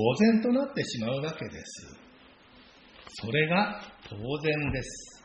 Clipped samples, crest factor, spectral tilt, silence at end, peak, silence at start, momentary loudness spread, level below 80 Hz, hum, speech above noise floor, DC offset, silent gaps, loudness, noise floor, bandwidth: under 0.1%; 20 dB; -5.5 dB/octave; 0.05 s; -10 dBFS; 0 s; 20 LU; -54 dBFS; none; 27 dB; under 0.1%; none; -29 LUFS; -55 dBFS; 9 kHz